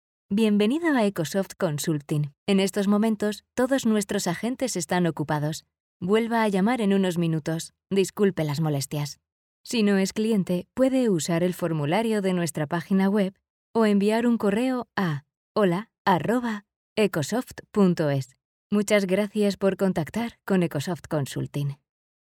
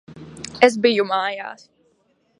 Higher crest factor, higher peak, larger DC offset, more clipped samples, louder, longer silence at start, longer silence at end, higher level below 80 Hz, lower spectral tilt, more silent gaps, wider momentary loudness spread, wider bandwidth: second, 16 dB vs 22 dB; second, -8 dBFS vs 0 dBFS; neither; neither; second, -25 LUFS vs -18 LUFS; first, 0.3 s vs 0.1 s; second, 0.55 s vs 0.85 s; about the same, -62 dBFS vs -62 dBFS; first, -6 dB/octave vs -4 dB/octave; first, 2.38-2.46 s, 5.80-6.00 s, 9.32-9.64 s, 13.50-13.74 s, 15.37-15.55 s, 15.98-16.05 s, 16.76-16.96 s, 18.45-18.70 s vs none; second, 8 LU vs 20 LU; first, 16.5 kHz vs 11 kHz